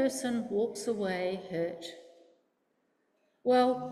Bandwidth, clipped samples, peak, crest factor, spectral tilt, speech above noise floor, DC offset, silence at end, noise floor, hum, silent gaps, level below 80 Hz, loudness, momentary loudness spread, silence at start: 14 kHz; under 0.1%; -16 dBFS; 18 dB; -4.5 dB/octave; 45 dB; under 0.1%; 0 s; -76 dBFS; none; none; -74 dBFS; -31 LUFS; 10 LU; 0 s